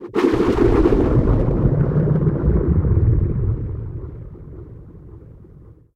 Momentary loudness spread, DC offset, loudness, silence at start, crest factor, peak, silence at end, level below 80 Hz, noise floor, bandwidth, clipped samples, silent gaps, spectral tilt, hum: 21 LU; under 0.1%; -18 LUFS; 0 s; 16 dB; -2 dBFS; 0.25 s; -24 dBFS; -44 dBFS; 8.2 kHz; under 0.1%; none; -10 dB/octave; none